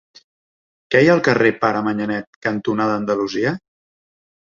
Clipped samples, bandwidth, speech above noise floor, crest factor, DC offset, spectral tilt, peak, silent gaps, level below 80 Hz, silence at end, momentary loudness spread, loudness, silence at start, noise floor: under 0.1%; 7.4 kHz; over 72 dB; 18 dB; under 0.1%; -6.5 dB/octave; -2 dBFS; 2.27-2.42 s; -58 dBFS; 0.95 s; 10 LU; -18 LUFS; 0.9 s; under -90 dBFS